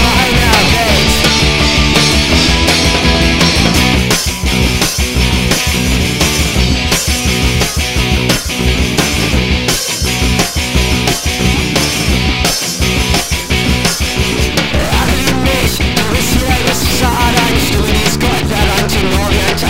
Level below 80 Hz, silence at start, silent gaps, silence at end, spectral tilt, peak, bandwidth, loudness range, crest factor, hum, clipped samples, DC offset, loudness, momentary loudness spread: -18 dBFS; 0 s; none; 0 s; -3.5 dB/octave; 0 dBFS; 16.5 kHz; 3 LU; 12 dB; none; under 0.1%; under 0.1%; -11 LUFS; 4 LU